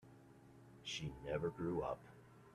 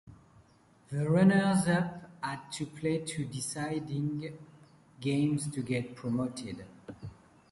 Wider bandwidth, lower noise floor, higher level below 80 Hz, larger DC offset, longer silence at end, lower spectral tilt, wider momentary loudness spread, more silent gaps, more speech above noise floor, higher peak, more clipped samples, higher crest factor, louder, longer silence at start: first, 13.5 kHz vs 11.5 kHz; about the same, -63 dBFS vs -62 dBFS; about the same, -66 dBFS vs -64 dBFS; neither; second, 0 s vs 0.4 s; about the same, -5.5 dB/octave vs -6 dB/octave; about the same, 22 LU vs 20 LU; neither; second, 19 dB vs 31 dB; second, -28 dBFS vs -12 dBFS; neither; about the same, 18 dB vs 20 dB; second, -44 LUFS vs -32 LUFS; about the same, 0.05 s vs 0.1 s